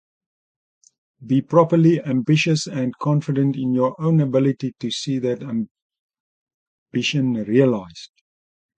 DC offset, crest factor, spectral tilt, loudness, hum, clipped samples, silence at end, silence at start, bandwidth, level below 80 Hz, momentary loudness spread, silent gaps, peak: under 0.1%; 18 dB; -6.5 dB/octave; -20 LUFS; none; under 0.1%; 0.7 s; 1.2 s; 9.2 kHz; -62 dBFS; 11 LU; 5.71-5.75 s, 5.82-5.90 s, 5.99-6.09 s, 6.20-6.46 s, 6.54-6.86 s; -2 dBFS